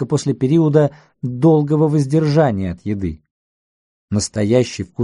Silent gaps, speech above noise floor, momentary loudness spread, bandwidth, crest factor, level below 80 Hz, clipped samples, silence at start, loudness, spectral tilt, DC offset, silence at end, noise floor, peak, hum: 3.31-4.08 s; over 74 dB; 10 LU; 11.5 kHz; 16 dB; -46 dBFS; under 0.1%; 0 s; -17 LUFS; -7 dB/octave; under 0.1%; 0 s; under -90 dBFS; -2 dBFS; none